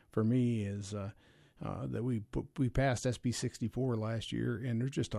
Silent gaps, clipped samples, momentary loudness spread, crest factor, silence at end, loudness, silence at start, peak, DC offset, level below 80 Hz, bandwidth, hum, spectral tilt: none; under 0.1%; 10 LU; 14 dB; 0 s; -35 LUFS; 0.15 s; -20 dBFS; under 0.1%; -52 dBFS; 12 kHz; none; -6.5 dB/octave